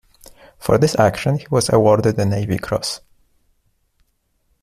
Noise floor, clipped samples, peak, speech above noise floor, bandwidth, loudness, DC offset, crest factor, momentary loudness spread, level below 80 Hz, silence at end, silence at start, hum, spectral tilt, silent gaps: -65 dBFS; under 0.1%; -2 dBFS; 49 dB; 15 kHz; -17 LUFS; under 0.1%; 18 dB; 10 LU; -46 dBFS; 1.65 s; 0.6 s; none; -5.5 dB/octave; none